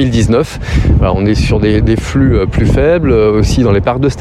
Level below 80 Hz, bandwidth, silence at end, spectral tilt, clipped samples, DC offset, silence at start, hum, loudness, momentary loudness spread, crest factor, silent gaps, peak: -18 dBFS; 12.5 kHz; 0 s; -7 dB/octave; under 0.1%; under 0.1%; 0 s; none; -11 LUFS; 3 LU; 8 dB; none; 0 dBFS